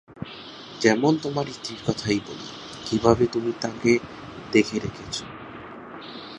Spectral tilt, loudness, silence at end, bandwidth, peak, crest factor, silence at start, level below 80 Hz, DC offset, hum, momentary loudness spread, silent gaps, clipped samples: -5 dB/octave; -24 LUFS; 0 s; 10.5 kHz; -2 dBFS; 24 dB; 0.1 s; -52 dBFS; under 0.1%; none; 19 LU; none; under 0.1%